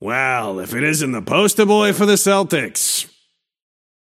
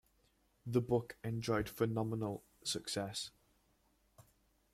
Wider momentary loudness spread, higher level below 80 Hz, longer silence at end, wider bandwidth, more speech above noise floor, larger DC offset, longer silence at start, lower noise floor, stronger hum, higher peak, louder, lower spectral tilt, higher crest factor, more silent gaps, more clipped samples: about the same, 8 LU vs 8 LU; about the same, -64 dBFS vs -66 dBFS; first, 1.05 s vs 0.5 s; about the same, 16.5 kHz vs 16 kHz; first, 46 dB vs 37 dB; neither; second, 0 s vs 0.65 s; second, -62 dBFS vs -75 dBFS; neither; first, -2 dBFS vs -20 dBFS; first, -16 LUFS vs -39 LUFS; second, -3.5 dB/octave vs -5 dB/octave; about the same, 16 dB vs 20 dB; neither; neither